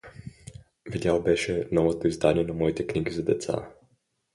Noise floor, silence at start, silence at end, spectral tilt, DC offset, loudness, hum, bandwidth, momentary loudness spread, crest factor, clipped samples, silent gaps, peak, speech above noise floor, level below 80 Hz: -68 dBFS; 0.05 s; 0.65 s; -6 dB/octave; under 0.1%; -26 LUFS; none; 11.5 kHz; 21 LU; 22 dB; under 0.1%; none; -6 dBFS; 43 dB; -48 dBFS